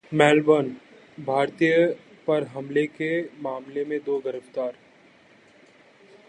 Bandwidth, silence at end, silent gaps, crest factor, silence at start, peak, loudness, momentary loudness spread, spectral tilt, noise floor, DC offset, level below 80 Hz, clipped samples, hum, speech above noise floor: 9.8 kHz; 1.55 s; none; 22 dB; 0.1 s; -2 dBFS; -24 LUFS; 14 LU; -6 dB/octave; -55 dBFS; under 0.1%; -72 dBFS; under 0.1%; none; 32 dB